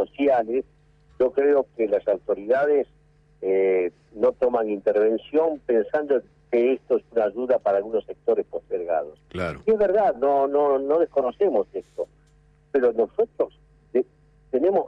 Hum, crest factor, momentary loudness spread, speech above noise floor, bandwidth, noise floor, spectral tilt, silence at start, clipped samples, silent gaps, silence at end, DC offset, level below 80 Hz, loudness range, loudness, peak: none; 12 dB; 9 LU; 35 dB; 5.6 kHz; -57 dBFS; -8 dB/octave; 0 s; under 0.1%; none; 0 s; under 0.1%; -58 dBFS; 2 LU; -23 LUFS; -12 dBFS